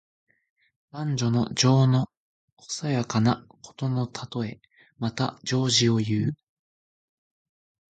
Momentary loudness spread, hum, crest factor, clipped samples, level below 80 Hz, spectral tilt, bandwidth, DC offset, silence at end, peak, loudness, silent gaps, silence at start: 13 LU; none; 18 dB; under 0.1%; -60 dBFS; -5 dB/octave; 9.2 kHz; under 0.1%; 1.6 s; -8 dBFS; -25 LUFS; 2.17-2.57 s; 0.95 s